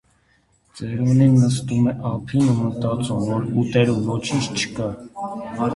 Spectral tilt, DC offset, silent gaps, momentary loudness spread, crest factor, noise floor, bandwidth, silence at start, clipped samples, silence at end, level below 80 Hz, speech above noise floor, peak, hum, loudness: -6.5 dB/octave; under 0.1%; none; 14 LU; 16 dB; -61 dBFS; 11.5 kHz; 0.75 s; under 0.1%; 0 s; -50 dBFS; 41 dB; -4 dBFS; none; -21 LUFS